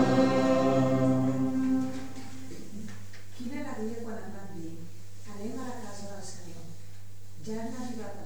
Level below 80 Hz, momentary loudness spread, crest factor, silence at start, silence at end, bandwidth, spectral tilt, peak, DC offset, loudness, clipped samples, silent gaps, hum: -64 dBFS; 23 LU; 20 dB; 0 s; 0 s; over 20 kHz; -6.5 dB/octave; -12 dBFS; 2%; -30 LUFS; under 0.1%; none; none